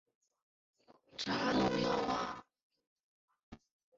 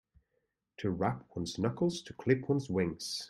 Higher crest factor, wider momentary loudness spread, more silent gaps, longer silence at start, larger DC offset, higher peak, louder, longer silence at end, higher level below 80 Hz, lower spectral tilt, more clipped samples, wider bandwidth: about the same, 18 dB vs 22 dB; first, 15 LU vs 8 LU; first, 2.63-2.70 s, 2.87-3.28 s, 3.43-3.52 s vs none; first, 1.15 s vs 0.8 s; neither; second, -22 dBFS vs -14 dBFS; about the same, -35 LUFS vs -34 LUFS; first, 0.4 s vs 0 s; about the same, -64 dBFS vs -64 dBFS; second, -3.5 dB/octave vs -6 dB/octave; neither; second, 7.6 kHz vs 13 kHz